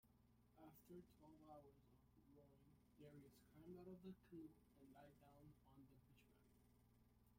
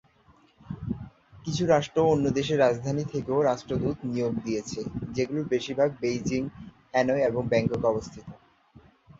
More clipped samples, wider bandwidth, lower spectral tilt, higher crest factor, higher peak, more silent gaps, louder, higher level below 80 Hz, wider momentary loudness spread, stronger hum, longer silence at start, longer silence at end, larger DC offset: neither; first, 16 kHz vs 7.8 kHz; about the same, -7 dB/octave vs -6 dB/octave; about the same, 18 dB vs 20 dB; second, -48 dBFS vs -8 dBFS; neither; second, -65 LUFS vs -27 LUFS; second, -82 dBFS vs -54 dBFS; second, 8 LU vs 14 LU; neither; second, 0.05 s vs 0.65 s; second, 0 s vs 0.85 s; neither